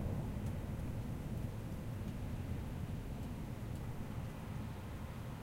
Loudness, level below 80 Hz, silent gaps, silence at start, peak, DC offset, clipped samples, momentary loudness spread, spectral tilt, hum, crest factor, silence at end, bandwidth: -44 LUFS; -48 dBFS; none; 0 s; -28 dBFS; under 0.1%; under 0.1%; 3 LU; -7.5 dB/octave; none; 14 dB; 0 s; 16 kHz